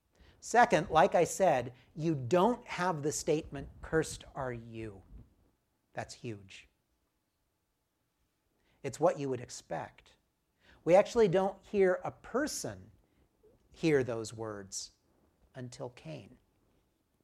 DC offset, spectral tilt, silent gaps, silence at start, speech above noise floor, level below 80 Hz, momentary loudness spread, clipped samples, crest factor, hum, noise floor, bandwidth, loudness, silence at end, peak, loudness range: under 0.1%; -5 dB/octave; none; 0.45 s; 49 dB; -62 dBFS; 20 LU; under 0.1%; 22 dB; none; -81 dBFS; 15 kHz; -31 LUFS; 0.95 s; -12 dBFS; 18 LU